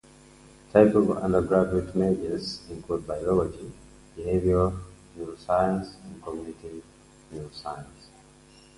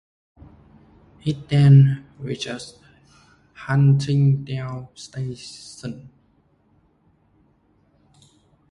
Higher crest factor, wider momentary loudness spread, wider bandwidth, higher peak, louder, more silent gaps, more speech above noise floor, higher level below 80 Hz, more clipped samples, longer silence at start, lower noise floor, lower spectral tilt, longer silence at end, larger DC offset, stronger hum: about the same, 24 dB vs 20 dB; about the same, 21 LU vs 22 LU; first, 11.5 kHz vs 10 kHz; about the same, -4 dBFS vs -4 dBFS; second, -25 LUFS vs -20 LUFS; neither; second, 28 dB vs 42 dB; first, -46 dBFS vs -54 dBFS; neither; second, 0.75 s vs 1.25 s; second, -53 dBFS vs -61 dBFS; about the same, -7.5 dB/octave vs -7.5 dB/octave; second, 0.9 s vs 2.7 s; neither; neither